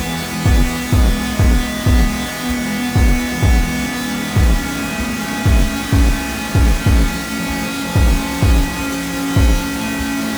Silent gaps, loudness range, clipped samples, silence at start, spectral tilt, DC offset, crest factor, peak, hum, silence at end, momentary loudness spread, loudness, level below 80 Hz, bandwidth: none; 1 LU; under 0.1%; 0 s; -5 dB/octave; under 0.1%; 14 dB; -2 dBFS; none; 0 s; 5 LU; -17 LUFS; -18 dBFS; over 20 kHz